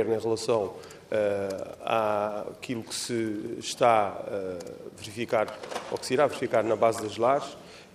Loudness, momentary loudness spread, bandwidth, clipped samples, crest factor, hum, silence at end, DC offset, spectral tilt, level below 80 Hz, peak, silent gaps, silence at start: -28 LUFS; 12 LU; 15 kHz; under 0.1%; 20 dB; none; 0.1 s; under 0.1%; -4.5 dB/octave; -70 dBFS; -8 dBFS; none; 0 s